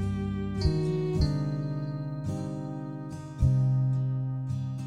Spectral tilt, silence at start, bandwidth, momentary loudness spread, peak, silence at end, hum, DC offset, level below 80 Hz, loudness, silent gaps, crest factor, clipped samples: -8.5 dB/octave; 0 s; 9.6 kHz; 11 LU; -14 dBFS; 0 s; none; under 0.1%; -38 dBFS; -30 LUFS; none; 16 dB; under 0.1%